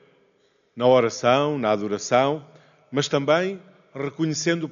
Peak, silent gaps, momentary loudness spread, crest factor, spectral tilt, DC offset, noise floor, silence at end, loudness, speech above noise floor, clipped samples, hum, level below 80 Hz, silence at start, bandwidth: -6 dBFS; none; 13 LU; 18 dB; -4 dB/octave; under 0.1%; -64 dBFS; 0 s; -22 LUFS; 42 dB; under 0.1%; none; -68 dBFS; 0.75 s; 7.4 kHz